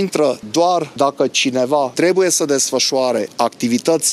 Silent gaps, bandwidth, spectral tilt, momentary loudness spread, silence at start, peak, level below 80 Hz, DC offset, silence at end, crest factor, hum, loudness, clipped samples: none; 15.5 kHz; -3 dB/octave; 4 LU; 0 s; -2 dBFS; -66 dBFS; under 0.1%; 0 s; 16 dB; none; -16 LUFS; under 0.1%